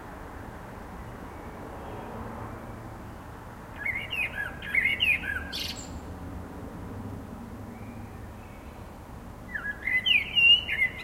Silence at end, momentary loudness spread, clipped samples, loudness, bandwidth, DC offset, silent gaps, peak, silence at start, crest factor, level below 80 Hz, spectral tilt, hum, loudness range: 0 s; 22 LU; under 0.1%; -24 LUFS; 16 kHz; under 0.1%; none; -12 dBFS; 0 s; 20 dB; -48 dBFS; -3 dB/octave; none; 16 LU